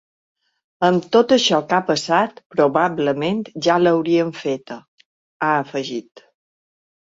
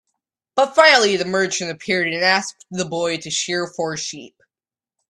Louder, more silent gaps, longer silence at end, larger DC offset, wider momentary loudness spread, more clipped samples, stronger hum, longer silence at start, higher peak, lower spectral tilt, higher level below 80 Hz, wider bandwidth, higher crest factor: about the same, -19 LUFS vs -18 LUFS; first, 2.46-2.50 s, 4.88-4.98 s, 5.05-5.40 s vs none; first, 1.05 s vs 0.85 s; neither; second, 11 LU vs 15 LU; neither; neither; first, 0.8 s vs 0.55 s; about the same, -2 dBFS vs 0 dBFS; first, -5 dB/octave vs -2.5 dB/octave; about the same, -64 dBFS vs -66 dBFS; second, 7.8 kHz vs 12 kHz; about the same, 18 dB vs 20 dB